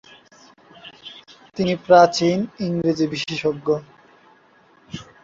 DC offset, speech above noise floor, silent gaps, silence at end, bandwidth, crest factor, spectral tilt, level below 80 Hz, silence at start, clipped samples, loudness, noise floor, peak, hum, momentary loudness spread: under 0.1%; 36 dB; none; 0.2 s; 7.8 kHz; 20 dB; -5.5 dB/octave; -58 dBFS; 0.85 s; under 0.1%; -19 LUFS; -54 dBFS; -2 dBFS; none; 25 LU